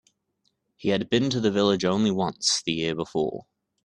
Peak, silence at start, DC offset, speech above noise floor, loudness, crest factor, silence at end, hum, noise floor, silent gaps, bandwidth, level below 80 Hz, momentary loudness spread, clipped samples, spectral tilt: -8 dBFS; 0.8 s; under 0.1%; 49 dB; -25 LUFS; 18 dB; 0.45 s; none; -74 dBFS; none; 11 kHz; -60 dBFS; 7 LU; under 0.1%; -4.5 dB/octave